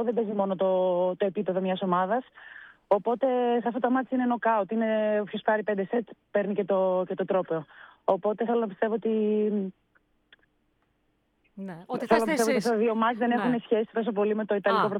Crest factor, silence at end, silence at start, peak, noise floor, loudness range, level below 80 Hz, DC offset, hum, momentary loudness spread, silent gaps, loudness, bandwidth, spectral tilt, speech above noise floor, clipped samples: 18 dB; 0 s; 0 s; -8 dBFS; -72 dBFS; 4 LU; -72 dBFS; under 0.1%; none; 7 LU; none; -27 LUFS; 16.5 kHz; -6 dB/octave; 45 dB; under 0.1%